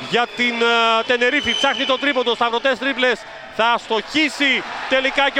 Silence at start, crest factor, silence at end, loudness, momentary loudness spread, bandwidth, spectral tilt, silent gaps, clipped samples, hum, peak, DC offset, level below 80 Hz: 0 s; 16 dB; 0 s; -17 LUFS; 5 LU; 11.5 kHz; -2.5 dB/octave; none; under 0.1%; none; -2 dBFS; under 0.1%; -54 dBFS